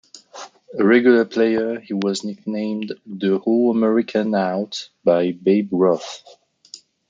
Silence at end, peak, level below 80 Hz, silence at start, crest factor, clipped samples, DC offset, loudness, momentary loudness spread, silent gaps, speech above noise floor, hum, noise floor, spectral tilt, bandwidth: 0.35 s; -2 dBFS; -70 dBFS; 0.15 s; 18 dB; under 0.1%; under 0.1%; -19 LUFS; 15 LU; none; 26 dB; none; -45 dBFS; -6 dB/octave; 7.6 kHz